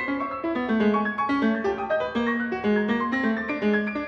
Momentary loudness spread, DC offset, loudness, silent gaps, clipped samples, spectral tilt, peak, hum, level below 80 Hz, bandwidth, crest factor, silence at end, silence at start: 4 LU; under 0.1%; -25 LUFS; none; under 0.1%; -7.5 dB/octave; -10 dBFS; none; -56 dBFS; 6.8 kHz; 14 dB; 0 s; 0 s